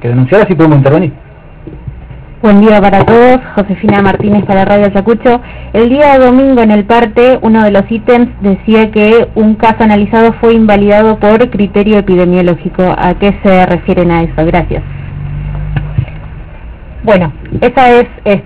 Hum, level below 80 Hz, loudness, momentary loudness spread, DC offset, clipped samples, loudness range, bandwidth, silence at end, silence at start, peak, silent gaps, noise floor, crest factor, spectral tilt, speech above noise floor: none; -26 dBFS; -7 LUFS; 12 LU; under 0.1%; 3%; 5 LU; 4 kHz; 0 s; 0 s; 0 dBFS; none; -28 dBFS; 8 dB; -11.5 dB/octave; 22 dB